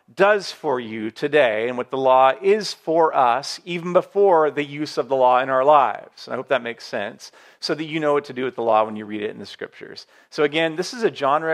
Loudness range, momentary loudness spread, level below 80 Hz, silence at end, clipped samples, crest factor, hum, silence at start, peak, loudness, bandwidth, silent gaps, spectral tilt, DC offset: 6 LU; 15 LU; -78 dBFS; 0 s; under 0.1%; 18 dB; none; 0.15 s; -2 dBFS; -20 LUFS; 13 kHz; none; -4.5 dB/octave; under 0.1%